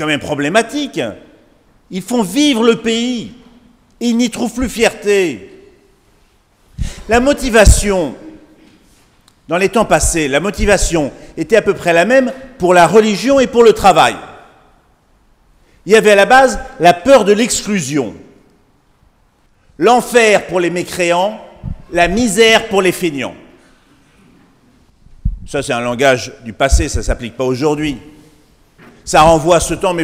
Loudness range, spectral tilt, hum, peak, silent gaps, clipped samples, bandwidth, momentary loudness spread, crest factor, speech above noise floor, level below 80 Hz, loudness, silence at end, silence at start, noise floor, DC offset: 7 LU; -4 dB/octave; none; 0 dBFS; none; 0.3%; 16.5 kHz; 16 LU; 14 dB; 41 dB; -26 dBFS; -12 LUFS; 0 s; 0 s; -53 dBFS; under 0.1%